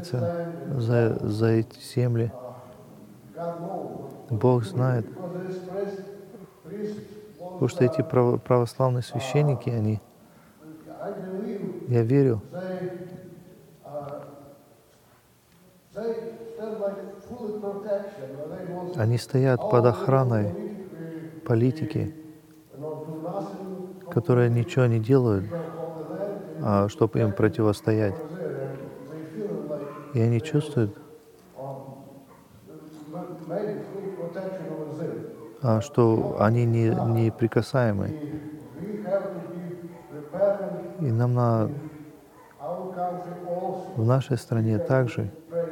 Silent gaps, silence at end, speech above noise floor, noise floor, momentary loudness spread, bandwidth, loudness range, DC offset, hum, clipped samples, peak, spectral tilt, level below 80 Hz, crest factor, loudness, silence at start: none; 0 s; 35 dB; -58 dBFS; 18 LU; 14.5 kHz; 10 LU; under 0.1%; none; under 0.1%; -6 dBFS; -8.5 dB/octave; -64 dBFS; 20 dB; -26 LUFS; 0 s